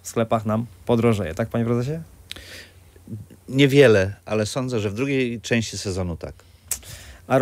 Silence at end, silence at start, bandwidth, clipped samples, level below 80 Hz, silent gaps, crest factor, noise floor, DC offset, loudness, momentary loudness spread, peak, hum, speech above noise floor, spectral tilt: 0 s; 0.05 s; 16 kHz; under 0.1%; -52 dBFS; none; 20 dB; -41 dBFS; under 0.1%; -22 LUFS; 22 LU; -2 dBFS; none; 20 dB; -5.5 dB/octave